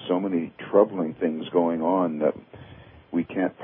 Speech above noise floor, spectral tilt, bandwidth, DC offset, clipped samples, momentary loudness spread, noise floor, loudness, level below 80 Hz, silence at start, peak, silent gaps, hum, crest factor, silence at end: 23 dB; -11 dB/octave; 3.8 kHz; under 0.1%; under 0.1%; 8 LU; -47 dBFS; -25 LUFS; -62 dBFS; 0 s; -4 dBFS; none; none; 20 dB; 0 s